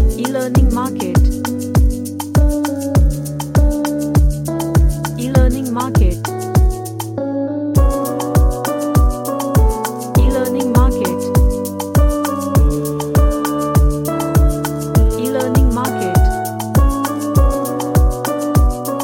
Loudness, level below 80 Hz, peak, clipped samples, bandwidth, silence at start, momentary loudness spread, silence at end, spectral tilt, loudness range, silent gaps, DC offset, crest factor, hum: -16 LUFS; -18 dBFS; 0 dBFS; under 0.1%; 17 kHz; 0 s; 5 LU; 0 s; -6.5 dB/octave; 1 LU; none; under 0.1%; 14 dB; none